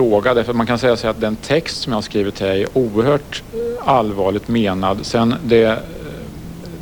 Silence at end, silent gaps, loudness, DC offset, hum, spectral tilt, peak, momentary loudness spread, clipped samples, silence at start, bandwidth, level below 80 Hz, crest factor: 0 s; none; -17 LUFS; under 0.1%; none; -6 dB/octave; 0 dBFS; 15 LU; under 0.1%; 0 s; 20 kHz; -40 dBFS; 16 dB